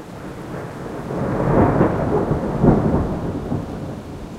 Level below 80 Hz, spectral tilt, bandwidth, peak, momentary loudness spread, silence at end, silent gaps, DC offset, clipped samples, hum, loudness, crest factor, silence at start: -32 dBFS; -9 dB/octave; 13.5 kHz; 0 dBFS; 15 LU; 0 s; none; under 0.1%; under 0.1%; none; -20 LUFS; 20 dB; 0 s